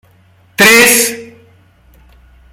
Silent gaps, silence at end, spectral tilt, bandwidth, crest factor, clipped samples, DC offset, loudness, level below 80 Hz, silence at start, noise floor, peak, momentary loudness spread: none; 1.25 s; -1.5 dB/octave; over 20 kHz; 14 dB; 0.2%; under 0.1%; -6 LUFS; -48 dBFS; 0.6 s; -48 dBFS; 0 dBFS; 22 LU